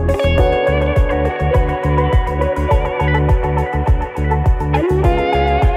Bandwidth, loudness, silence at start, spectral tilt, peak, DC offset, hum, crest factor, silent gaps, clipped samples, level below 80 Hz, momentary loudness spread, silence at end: 9.4 kHz; -16 LUFS; 0 s; -8 dB/octave; -2 dBFS; under 0.1%; none; 12 dB; none; under 0.1%; -18 dBFS; 3 LU; 0 s